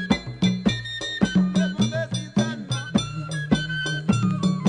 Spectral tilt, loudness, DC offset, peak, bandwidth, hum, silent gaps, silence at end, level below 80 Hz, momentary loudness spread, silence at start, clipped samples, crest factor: -5.5 dB/octave; -24 LUFS; under 0.1%; -6 dBFS; 10 kHz; none; none; 0 s; -46 dBFS; 6 LU; 0 s; under 0.1%; 18 dB